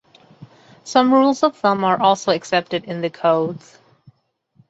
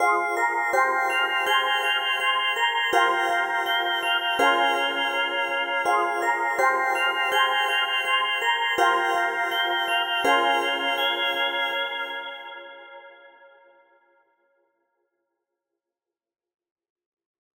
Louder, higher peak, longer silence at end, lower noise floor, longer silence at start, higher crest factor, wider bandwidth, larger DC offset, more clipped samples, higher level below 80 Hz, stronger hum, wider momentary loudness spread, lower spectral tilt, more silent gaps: first, -18 LUFS vs -22 LUFS; first, -2 dBFS vs -6 dBFS; second, 1.1 s vs 4.25 s; second, -60 dBFS vs -88 dBFS; first, 0.4 s vs 0 s; about the same, 18 dB vs 18 dB; second, 8 kHz vs over 20 kHz; neither; neither; first, -66 dBFS vs -76 dBFS; neither; first, 11 LU vs 4 LU; first, -5 dB/octave vs -0.5 dB/octave; neither